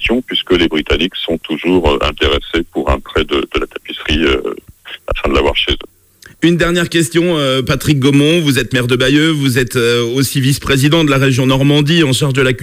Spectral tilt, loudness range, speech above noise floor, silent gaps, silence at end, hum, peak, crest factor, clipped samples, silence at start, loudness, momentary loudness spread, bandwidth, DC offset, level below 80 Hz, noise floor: -5 dB/octave; 4 LU; 30 dB; none; 0 s; none; 0 dBFS; 12 dB; under 0.1%; 0 s; -13 LUFS; 8 LU; 16 kHz; under 0.1%; -28 dBFS; -43 dBFS